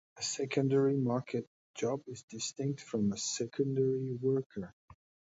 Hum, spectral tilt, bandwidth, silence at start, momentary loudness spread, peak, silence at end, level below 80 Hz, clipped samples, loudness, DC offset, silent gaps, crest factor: none; -5.5 dB/octave; 8 kHz; 0.15 s; 13 LU; -18 dBFS; 0.45 s; -72 dBFS; under 0.1%; -34 LUFS; under 0.1%; 1.47-1.74 s, 2.23-2.28 s, 4.46-4.50 s, 4.73-4.88 s; 16 dB